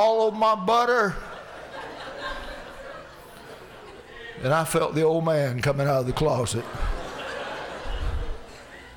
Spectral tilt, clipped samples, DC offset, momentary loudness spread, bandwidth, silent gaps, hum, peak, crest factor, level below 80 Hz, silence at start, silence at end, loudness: -5.5 dB/octave; under 0.1%; under 0.1%; 22 LU; over 20 kHz; none; none; -12 dBFS; 14 dB; -38 dBFS; 0 s; 0 s; -25 LUFS